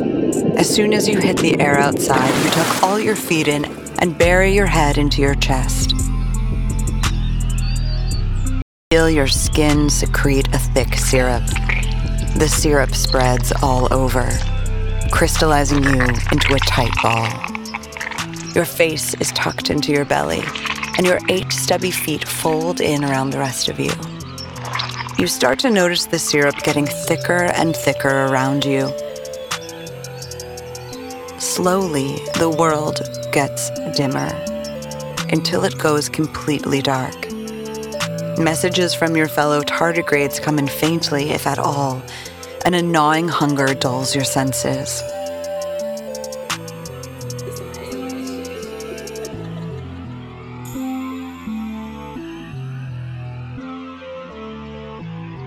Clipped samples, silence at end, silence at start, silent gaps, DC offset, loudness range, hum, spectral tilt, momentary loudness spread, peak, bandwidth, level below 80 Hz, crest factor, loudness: under 0.1%; 0 s; 0 s; 8.62-8.91 s; under 0.1%; 13 LU; none; -4.5 dB/octave; 15 LU; 0 dBFS; 19 kHz; -26 dBFS; 18 dB; -18 LUFS